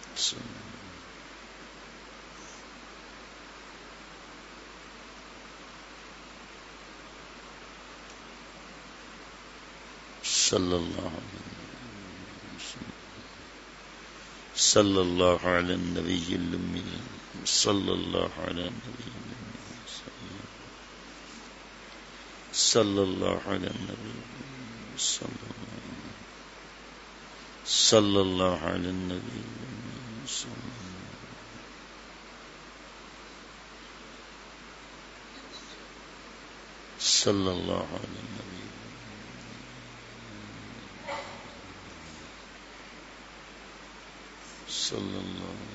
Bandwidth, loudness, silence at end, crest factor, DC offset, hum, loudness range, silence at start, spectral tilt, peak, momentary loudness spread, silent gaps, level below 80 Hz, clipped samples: 8.2 kHz; -29 LUFS; 0 s; 28 dB; under 0.1%; none; 19 LU; 0 s; -3 dB/octave; -6 dBFS; 22 LU; none; -58 dBFS; under 0.1%